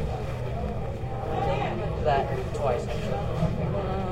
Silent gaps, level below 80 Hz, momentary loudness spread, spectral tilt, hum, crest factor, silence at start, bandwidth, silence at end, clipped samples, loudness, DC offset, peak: none; -36 dBFS; 6 LU; -7.5 dB/octave; none; 16 dB; 0 s; 13 kHz; 0 s; under 0.1%; -29 LUFS; under 0.1%; -12 dBFS